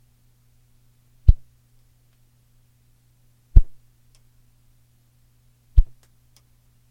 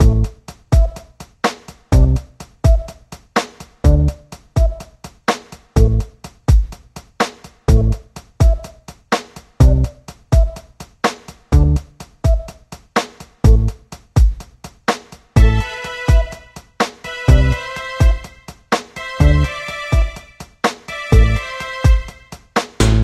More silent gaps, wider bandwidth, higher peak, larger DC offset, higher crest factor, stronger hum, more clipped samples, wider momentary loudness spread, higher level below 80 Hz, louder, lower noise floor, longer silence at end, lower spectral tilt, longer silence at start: neither; second, 0.9 kHz vs 13 kHz; about the same, 0 dBFS vs 0 dBFS; neither; first, 22 dB vs 16 dB; neither; neither; second, 11 LU vs 17 LU; second, -24 dBFS vs -18 dBFS; second, -23 LUFS vs -18 LUFS; first, -59 dBFS vs -38 dBFS; first, 1.05 s vs 0 s; first, -9 dB/octave vs -6 dB/octave; first, 1.25 s vs 0 s